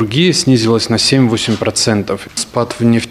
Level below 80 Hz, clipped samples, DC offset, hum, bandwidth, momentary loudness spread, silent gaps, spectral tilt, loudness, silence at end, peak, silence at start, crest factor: -46 dBFS; under 0.1%; under 0.1%; none; 14.5 kHz; 8 LU; none; -4.5 dB/octave; -13 LUFS; 0 s; 0 dBFS; 0 s; 12 dB